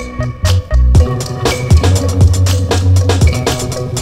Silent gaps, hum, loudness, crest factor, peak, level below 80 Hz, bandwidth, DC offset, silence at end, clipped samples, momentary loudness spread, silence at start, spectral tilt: none; none; -12 LUFS; 10 dB; 0 dBFS; -16 dBFS; 15 kHz; under 0.1%; 0 s; 0.6%; 6 LU; 0 s; -5.5 dB/octave